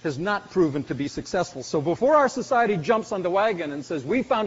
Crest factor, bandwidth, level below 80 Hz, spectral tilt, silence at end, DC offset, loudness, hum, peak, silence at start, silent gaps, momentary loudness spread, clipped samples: 16 dB; 8 kHz; -56 dBFS; -4.5 dB/octave; 0 s; under 0.1%; -24 LUFS; none; -8 dBFS; 0.05 s; none; 10 LU; under 0.1%